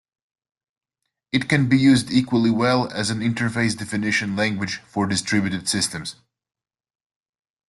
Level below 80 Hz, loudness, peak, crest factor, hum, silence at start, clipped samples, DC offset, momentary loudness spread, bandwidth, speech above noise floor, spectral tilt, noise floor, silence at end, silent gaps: -56 dBFS; -21 LUFS; -6 dBFS; 18 dB; none; 1.35 s; under 0.1%; under 0.1%; 9 LU; 12.5 kHz; 60 dB; -4.5 dB/octave; -81 dBFS; 1.55 s; none